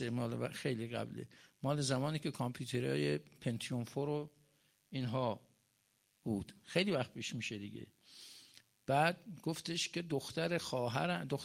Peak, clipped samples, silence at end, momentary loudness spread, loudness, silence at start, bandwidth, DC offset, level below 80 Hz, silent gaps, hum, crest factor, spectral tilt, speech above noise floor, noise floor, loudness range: -18 dBFS; under 0.1%; 0 s; 15 LU; -39 LUFS; 0 s; 16 kHz; under 0.1%; -74 dBFS; none; none; 22 dB; -5 dB/octave; 39 dB; -77 dBFS; 3 LU